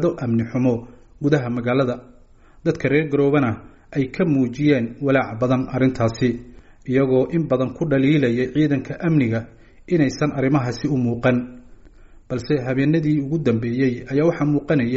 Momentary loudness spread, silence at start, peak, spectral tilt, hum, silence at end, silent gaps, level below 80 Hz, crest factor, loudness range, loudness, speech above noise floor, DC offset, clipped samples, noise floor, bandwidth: 7 LU; 0 s; -2 dBFS; -7.5 dB/octave; none; 0 s; none; -48 dBFS; 18 dB; 2 LU; -20 LUFS; 29 dB; under 0.1%; under 0.1%; -48 dBFS; 7.8 kHz